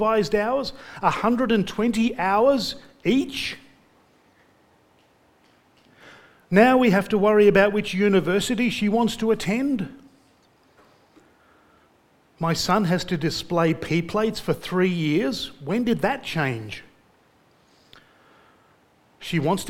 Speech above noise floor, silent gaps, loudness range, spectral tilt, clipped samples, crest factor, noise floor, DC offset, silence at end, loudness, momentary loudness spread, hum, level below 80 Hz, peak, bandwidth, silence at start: 38 dB; none; 11 LU; -5.5 dB/octave; under 0.1%; 22 dB; -60 dBFS; under 0.1%; 0 s; -22 LUFS; 12 LU; none; -52 dBFS; -2 dBFS; 17 kHz; 0 s